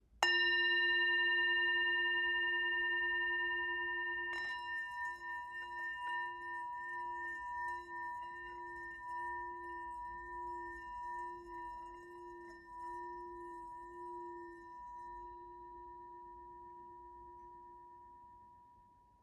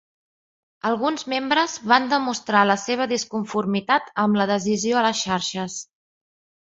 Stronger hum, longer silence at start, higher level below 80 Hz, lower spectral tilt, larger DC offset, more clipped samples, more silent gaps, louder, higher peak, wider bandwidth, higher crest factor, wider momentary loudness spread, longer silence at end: neither; second, 0.15 s vs 0.85 s; about the same, -68 dBFS vs -64 dBFS; second, -1.5 dB/octave vs -3.5 dB/octave; neither; neither; neither; second, -37 LUFS vs -22 LUFS; second, -14 dBFS vs -2 dBFS; first, 13.5 kHz vs 8 kHz; first, 26 dB vs 20 dB; first, 23 LU vs 7 LU; second, 0.35 s vs 0.85 s